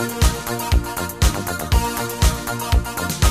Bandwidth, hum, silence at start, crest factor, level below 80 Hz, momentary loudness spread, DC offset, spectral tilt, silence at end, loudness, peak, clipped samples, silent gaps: 16 kHz; none; 0 s; 16 dB; -22 dBFS; 5 LU; 0.2%; -4 dB/octave; 0 s; -21 LUFS; -4 dBFS; under 0.1%; none